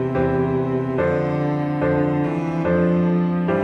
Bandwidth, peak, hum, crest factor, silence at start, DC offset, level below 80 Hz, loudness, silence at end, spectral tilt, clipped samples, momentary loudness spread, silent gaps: 6 kHz; -8 dBFS; none; 12 dB; 0 s; under 0.1%; -46 dBFS; -20 LUFS; 0 s; -10 dB/octave; under 0.1%; 4 LU; none